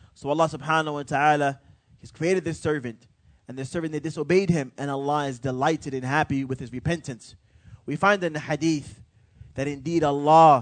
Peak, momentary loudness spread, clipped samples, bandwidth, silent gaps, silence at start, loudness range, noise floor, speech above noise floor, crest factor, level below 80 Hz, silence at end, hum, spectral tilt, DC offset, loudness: -4 dBFS; 13 LU; under 0.1%; 9.4 kHz; none; 0.25 s; 2 LU; -51 dBFS; 27 dB; 20 dB; -56 dBFS; 0 s; none; -6 dB/octave; under 0.1%; -24 LUFS